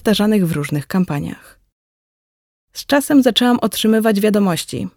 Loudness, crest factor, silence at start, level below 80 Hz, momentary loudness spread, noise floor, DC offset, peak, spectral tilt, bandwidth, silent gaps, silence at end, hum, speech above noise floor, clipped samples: -16 LUFS; 16 dB; 0.05 s; -50 dBFS; 11 LU; under -90 dBFS; under 0.1%; -2 dBFS; -5 dB/octave; 18.5 kHz; 1.72-2.68 s; 0.05 s; none; over 74 dB; under 0.1%